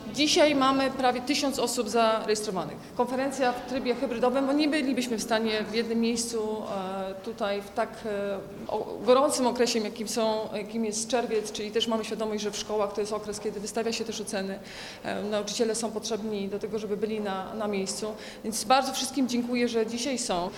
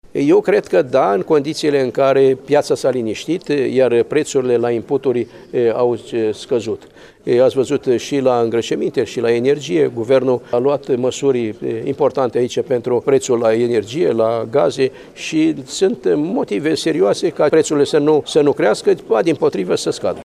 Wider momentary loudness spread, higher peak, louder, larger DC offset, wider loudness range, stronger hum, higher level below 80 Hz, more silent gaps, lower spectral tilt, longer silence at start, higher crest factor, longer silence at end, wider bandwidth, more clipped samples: first, 9 LU vs 6 LU; second, -8 dBFS vs -2 dBFS; second, -28 LUFS vs -16 LUFS; neither; about the same, 4 LU vs 2 LU; neither; about the same, -60 dBFS vs -58 dBFS; neither; second, -3.5 dB/octave vs -5.5 dB/octave; second, 0 s vs 0.15 s; first, 20 dB vs 14 dB; about the same, 0 s vs 0 s; first, 17 kHz vs 12.5 kHz; neither